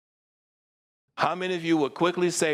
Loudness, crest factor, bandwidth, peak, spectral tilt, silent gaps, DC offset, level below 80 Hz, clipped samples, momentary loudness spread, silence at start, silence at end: -26 LUFS; 18 dB; 15.5 kHz; -10 dBFS; -4 dB/octave; none; under 0.1%; -76 dBFS; under 0.1%; 5 LU; 1.15 s; 0 s